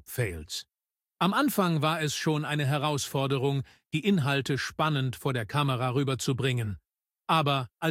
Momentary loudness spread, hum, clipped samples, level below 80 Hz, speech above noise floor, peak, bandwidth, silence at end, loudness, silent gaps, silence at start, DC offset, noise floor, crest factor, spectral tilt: 9 LU; none; under 0.1%; -58 dBFS; 28 dB; -10 dBFS; 16.5 kHz; 0 s; -28 LUFS; none; 0.1 s; under 0.1%; -55 dBFS; 18 dB; -5 dB/octave